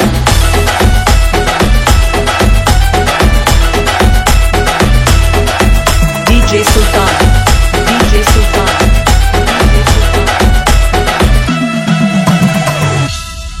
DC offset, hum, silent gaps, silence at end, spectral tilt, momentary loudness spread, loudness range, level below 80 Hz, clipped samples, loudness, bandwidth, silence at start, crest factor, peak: under 0.1%; none; none; 0 s; -4.5 dB/octave; 2 LU; 1 LU; -10 dBFS; 1%; -9 LUFS; 16.5 kHz; 0 s; 8 dB; 0 dBFS